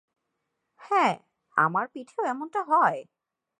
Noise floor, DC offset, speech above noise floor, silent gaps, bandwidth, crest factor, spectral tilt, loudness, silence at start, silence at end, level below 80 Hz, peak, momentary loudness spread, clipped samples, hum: -80 dBFS; under 0.1%; 55 dB; none; 10.5 kHz; 20 dB; -5.5 dB/octave; -26 LUFS; 0.8 s; 0.55 s; -84 dBFS; -8 dBFS; 11 LU; under 0.1%; none